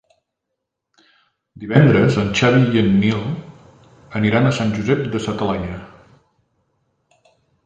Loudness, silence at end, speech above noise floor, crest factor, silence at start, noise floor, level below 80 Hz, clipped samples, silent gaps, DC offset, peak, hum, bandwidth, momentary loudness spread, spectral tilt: -17 LUFS; 1.8 s; 63 dB; 18 dB; 1.55 s; -79 dBFS; -46 dBFS; under 0.1%; none; under 0.1%; 0 dBFS; none; 8.8 kHz; 16 LU; -7 dB/octave